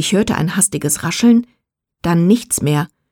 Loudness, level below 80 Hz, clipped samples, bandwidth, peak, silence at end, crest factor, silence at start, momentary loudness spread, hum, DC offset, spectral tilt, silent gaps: -15 LUFS; -46 dBFS; under 0.1%; 19 kHz; -2 dBFS; 0.25 s; 14 dB; 0 s; 5 LU; none; under 0.1%; -4.5 dB/octave; none